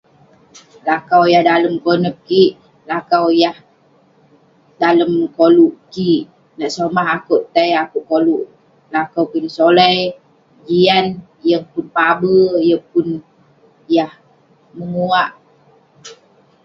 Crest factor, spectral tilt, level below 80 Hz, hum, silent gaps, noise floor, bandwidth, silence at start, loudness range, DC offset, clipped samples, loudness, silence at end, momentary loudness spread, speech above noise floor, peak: 16 dB; -6 dB/octave; -60 dBFS; none; none; -52 dBFS; 7.6 kHz; 0.85 s; 3 LU; under 0.1%; under 0.1%; -15 LUFS; 0.5 s; 12 LU; 38 dB; 0 dBFS